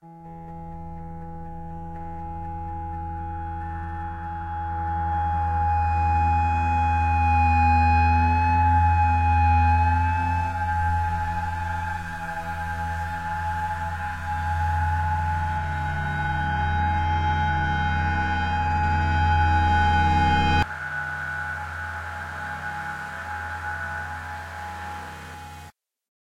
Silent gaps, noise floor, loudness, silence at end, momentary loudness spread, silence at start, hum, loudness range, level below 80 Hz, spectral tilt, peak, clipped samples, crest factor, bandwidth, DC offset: none; -48 dBFS; -24 LUFS; 0.55 s; 16 LU; 0.05 s; none; 12 LU; -32 dBFS; -6.5 dB/octave; -10 dBFS; under 0.1%; 14 dB; 8.4 kHz; under 0.1%